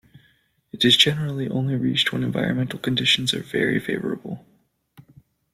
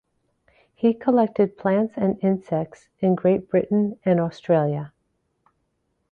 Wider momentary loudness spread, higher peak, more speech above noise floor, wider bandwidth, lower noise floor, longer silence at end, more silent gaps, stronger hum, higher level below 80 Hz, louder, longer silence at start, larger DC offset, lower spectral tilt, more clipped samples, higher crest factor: first, 12 LU vs 7 LU; first, -2 dBFS vs -6 dBFS; second, 40 dB vs 51 dB; first, 16 kHz vs 6.8 kHz; second, -63 dBFS vs -73 dBFS; second, 0.55 s vs 1.25 s; neither; neither; about the same, -58 dBFS vs -62 dBFS; about the same, -21 LUFS vs -22 LUFS; about the same, 0.75 s vs 0.8 s; neither; second, -4.5 dB/octave vs -10 dB/octave; neither; first, 22 dB vs 16 dB